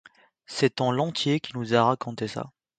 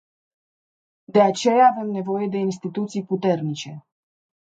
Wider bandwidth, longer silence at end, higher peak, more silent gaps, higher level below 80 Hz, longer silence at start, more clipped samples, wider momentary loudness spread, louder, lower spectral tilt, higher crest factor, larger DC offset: about the same, 9.4 kHz vs 9 kHz; second, 0.3 s vs 0.7 s; about the same, -6 dBFS vs -4 dBFS; neither; first, -66 dBFS vs -74 dBFS; second, 0.5 s vs 1.1 s; neither; about the same, 11 LU vs 12 LU; second, -26 LUFS vs -21 LUFS; about the same, -5.5 dB/octave vs -6 dB/octave; about the same, 20 dB vs 18 dB; neither